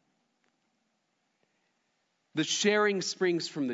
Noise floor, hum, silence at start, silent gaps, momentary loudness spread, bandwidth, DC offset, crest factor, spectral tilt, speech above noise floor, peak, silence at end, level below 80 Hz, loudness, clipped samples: -77 dBFS; none; 2.35 s; none; 8 LU; 7.8 kHz; under 0.1%; 20 dB; -3 dB/octave; 49 dB; -14 dBFS; 0 s; -88 dBFS; -28 LUFS; under 0.1%